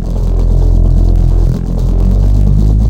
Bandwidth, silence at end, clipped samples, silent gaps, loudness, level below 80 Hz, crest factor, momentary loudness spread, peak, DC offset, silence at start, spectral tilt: 4.8 kHz; 0 s; under 0.1%; none; -12 LUFS; -10 dBFS; 8 dB; 4 LU; 0 dBFS; under 0.1%; 0 s; -9.5 dB/octave